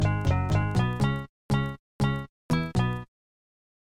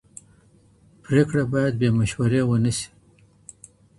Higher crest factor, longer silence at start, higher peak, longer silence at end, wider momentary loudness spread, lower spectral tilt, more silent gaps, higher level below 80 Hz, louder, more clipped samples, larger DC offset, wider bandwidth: about the same, 14 dB vs 18 dB; second, 0 s vs 1.1 s; second, -12 dBFS vs -6 dBFS; second, 0.95 s vs 1.15 s; second, 9 LU vs 16 LU; about the same, -7 dB/octave vs -6.5 dB/octave; first, 1.29-1.49 s, 1.79-1.99 s, 2.29-2.49 s vs none; first, -42 dBFS vs -50 dBFS; second, -28 LUFS vs -22 LUFS; neither; neither; first, 13 kHz vs 11.5 kHz